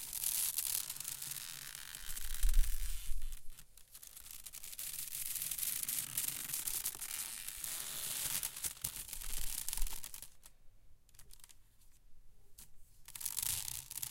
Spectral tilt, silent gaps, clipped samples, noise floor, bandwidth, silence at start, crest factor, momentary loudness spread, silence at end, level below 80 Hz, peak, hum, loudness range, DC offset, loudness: 0 dB/octave; none; under 0.1%; -60 dBFS; 17 kHz; 0 s; 24 dB; 19 LU; 0 s; -44 dBFS; -16 dBFS; none; 8 LU; under 0.1%; -39 LUFS